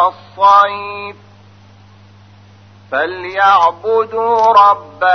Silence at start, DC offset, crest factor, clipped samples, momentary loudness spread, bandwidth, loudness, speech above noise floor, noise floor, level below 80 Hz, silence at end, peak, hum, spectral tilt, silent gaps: 0 s; 0.1%; 14 dB; under 0.1%; 14 LU; 6.4 kHz; -12 LUFS; 30 dB; -42 dBFS; -60 dBFS; 0 s; 0 dBFS; none; -4 dB/octave; none